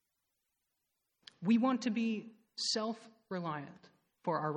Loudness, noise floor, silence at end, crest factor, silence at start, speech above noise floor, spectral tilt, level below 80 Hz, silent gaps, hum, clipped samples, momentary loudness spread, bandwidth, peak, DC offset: -36 LUFS; -85 dBFS; 0 s; 18 dB; 1.4 s; 50 dB; -4.5 dB/octave; -86 dBFS; none; none; under 0.1%; 15 LU; 10 kHz; -18 dBFS; under 0.1%